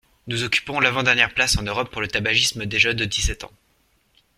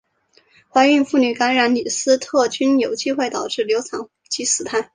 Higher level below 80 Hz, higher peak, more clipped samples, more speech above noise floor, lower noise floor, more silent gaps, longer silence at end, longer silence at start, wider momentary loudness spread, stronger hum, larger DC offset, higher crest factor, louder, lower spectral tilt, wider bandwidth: first, -38 dBFS vs -64 dBFS; about the same, -2 dBFS vs -2 dBFS; neither; about the same, 42 dB vs 40 dB; first, -64 dBFS vs -58 dBFS; neither; first, 0.9 s vs 0.1 s; second, 0.25 s vs 0.75 s; about the same, 9 LU vs 8 LU; neither; neither; first, 22 dB vs 16 dB; about the same, -20 LUFS vs -18 LUFS; about the same, -2.5 dB/octave vs -2 dB/octave; first, 16 kHz vs 10 kHz